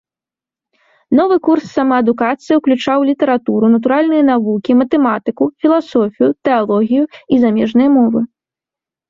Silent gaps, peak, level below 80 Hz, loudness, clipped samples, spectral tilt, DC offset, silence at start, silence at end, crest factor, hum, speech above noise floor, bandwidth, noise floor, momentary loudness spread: none; -2 dBFS; -56 dBFS; -13 LUFS; under 0.1%; -7.5 dB/octave; under 0.1%; 1.1 s; 0.85 s; 12 dB; none; 76 dB; 7.2 kHz; -89 dBFS; 4 LU